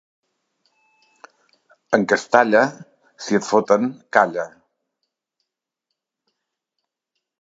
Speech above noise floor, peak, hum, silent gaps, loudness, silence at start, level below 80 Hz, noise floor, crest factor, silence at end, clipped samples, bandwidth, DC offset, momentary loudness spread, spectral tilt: 63 dB; 0 dBFS; none; none; -19 LUFS; 1.9 s; -70 dBFS; -81 dBFS; 22 dB; 2.95 s; under 0.1%; 7.8 kHz; under 0.1%; 10 LU; -5 dB/octave